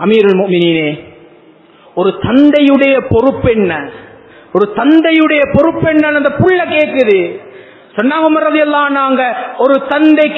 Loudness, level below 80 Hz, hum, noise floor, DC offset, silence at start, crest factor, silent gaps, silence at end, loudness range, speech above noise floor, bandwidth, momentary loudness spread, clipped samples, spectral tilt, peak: -10 LUFS; -40 dBFS; none; -42 dBFS; under 0.1%; 0 s; 10 dB; none; 0 s; 2 LU; 32 dB; 5 kHz; 9 LU; 0.3%; -8.5 dB/octave; 0 dBFS